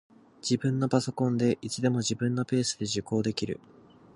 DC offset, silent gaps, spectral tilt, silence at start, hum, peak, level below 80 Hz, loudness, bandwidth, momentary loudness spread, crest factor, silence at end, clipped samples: under 0.1%; none; -5.5 dB/octave; 0.45 s; none; -8 dBFS; -62 dBFS; -29 LUFS; 11.5 kHz; 6 LU; 20 dB; 0.6 s; under 0.1%